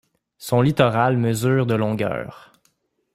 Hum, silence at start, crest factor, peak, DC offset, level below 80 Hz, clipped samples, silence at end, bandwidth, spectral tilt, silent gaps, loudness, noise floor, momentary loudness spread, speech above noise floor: none; 0.4 s; 18 dB; -4 dBFS; under 0.1%; -54 dBFS; under 0.1%; 0.8 s; 15.5 kHz; -6.5 dB/octave; none; -20 LUFS; -66 dBFS; 12 LU; 47 dB